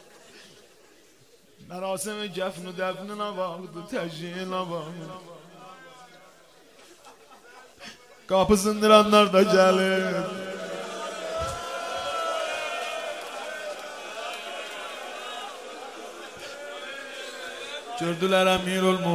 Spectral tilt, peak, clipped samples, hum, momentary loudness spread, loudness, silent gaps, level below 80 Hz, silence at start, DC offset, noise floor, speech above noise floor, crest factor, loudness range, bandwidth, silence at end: -4.5 dB/octave; -2 dBFS; under 0.1%; none; 21 LU; -26 LUFS; none; -56 dBFS; 0.15 s; under 0.1%; -57 dBFS; 34 dB; 24 dB; 15 LU; 16 kHz; 0 s